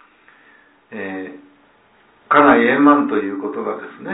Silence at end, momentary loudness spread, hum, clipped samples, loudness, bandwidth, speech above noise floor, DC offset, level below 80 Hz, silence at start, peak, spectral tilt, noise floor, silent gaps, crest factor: 0 s; 19 LU; none; under 0.1%; -15 LUFS; 4 kHz; 37 dB; under 0.1%; -58 dBFS; 0.9 s; 0 dBFS; -9.5 dB/octave; -54 dBFS; none; 18 dB